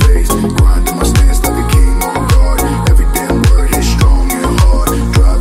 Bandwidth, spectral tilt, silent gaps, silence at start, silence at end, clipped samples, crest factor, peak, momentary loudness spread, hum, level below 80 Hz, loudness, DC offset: 16.5 kHz; -5.5 dB/octave; none; 0 s; 0 s; under 0.1%; 8 dB; 0 dBFS; 2 LU; none; -10 dBFS; -12 LUFS; under 0.1%